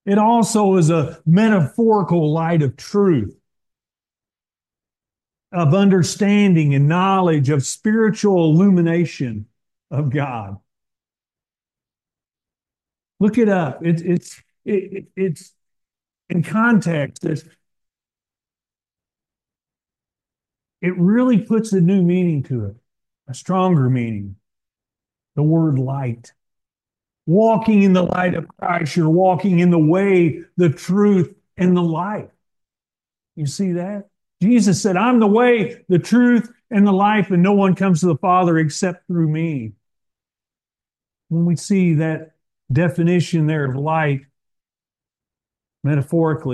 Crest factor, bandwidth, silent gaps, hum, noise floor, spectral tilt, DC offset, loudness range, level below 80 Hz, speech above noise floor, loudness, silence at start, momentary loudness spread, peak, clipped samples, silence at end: 14 dB; 12 kHz; none; none; under -90 dBFS; -7 dB/octave; under 0.1%; 8 LU; -60 dBFS; over 74 dB; -17 LUFS; 0.05 s; 12 LU; -4 dBFS; under 0.1%; 0 s